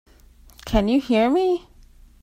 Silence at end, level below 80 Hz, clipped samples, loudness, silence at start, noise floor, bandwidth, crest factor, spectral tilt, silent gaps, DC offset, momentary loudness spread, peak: 0.65 s; -36 dBFS; under 0.1%; -21 LUFS; 0.65 s; -50 dBFS; 16 kHz; 18 dB; -6.5 dB/octave; none; under 0.1%; 8 LU; -4 dBFS